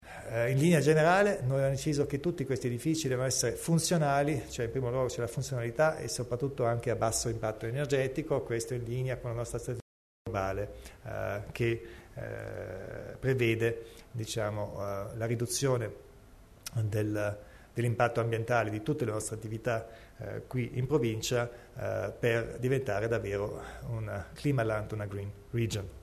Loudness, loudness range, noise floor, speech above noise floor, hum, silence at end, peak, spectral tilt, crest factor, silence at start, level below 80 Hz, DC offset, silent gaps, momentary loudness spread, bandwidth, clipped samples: -32 LUFS; 6 LU; -55 dBFS; 23 dB; none; 0 s; -12 dBFS; -5.5 dB/octave; 18 dB; 0 s; -54 dBFS; under 0.1%; 9.82-10.25 s; 13 LU; 13.5 kHz; under 0.1%